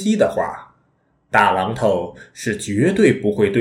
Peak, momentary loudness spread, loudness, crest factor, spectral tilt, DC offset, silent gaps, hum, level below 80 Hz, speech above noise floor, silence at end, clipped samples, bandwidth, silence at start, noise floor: 0 dBFS; 12 LU; -18 LUFS; 18 dB; -5.5 dB/octave; under 0.1%; none; none; -52 dBFS; 45 dB; 0 s; under 0.1%; 14.5 kHz; 0 s; -62 dBFS